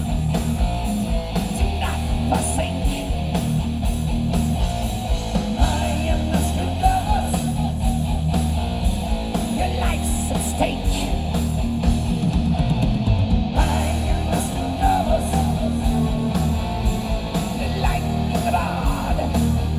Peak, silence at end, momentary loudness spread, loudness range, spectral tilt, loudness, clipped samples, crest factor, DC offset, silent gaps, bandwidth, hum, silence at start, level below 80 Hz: -2 dBFS; 0 s; 4 LU; 2 LU; -6 dB/octave; -22 LUFS; under 0.1%; 18 dB; under 0.1%; none; 16 kHz; none; 0 s; -24 dBFS